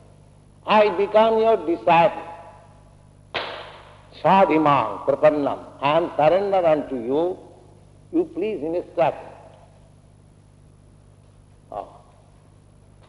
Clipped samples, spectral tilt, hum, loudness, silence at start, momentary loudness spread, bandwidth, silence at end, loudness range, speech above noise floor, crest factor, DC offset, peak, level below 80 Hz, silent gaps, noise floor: under 0.1%; -7 dB/octave; 50 Hz at -50 dBFS; -20 LUFS; 0.65 s; 19 LU; 11 kHz; 1.25 s; 10 LU; 32 dB; 20 dB; under 0.1%; -4 dBFS; -56 dBFS; none; -51 dBFS